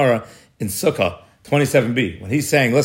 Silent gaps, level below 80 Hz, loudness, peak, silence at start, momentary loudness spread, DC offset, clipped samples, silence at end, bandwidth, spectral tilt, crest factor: none; -56 dBFS; -19 LUFS; -2 dBFS; 0 s; 7 LU; under 0.1%; under 0.1%; 0 s; 16.5 kHz; -5 dB/octave; 16 dB